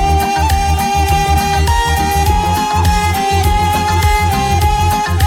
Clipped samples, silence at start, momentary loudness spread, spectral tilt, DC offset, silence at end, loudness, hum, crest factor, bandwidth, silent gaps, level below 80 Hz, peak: under 0.1%; 0 s; 1 LU; -4.5 dB/octave; under 0.1%; 0 s; -13 LUFS; none; 12 dB; 17 kHz; none; -18 dBFS; 0 dBFS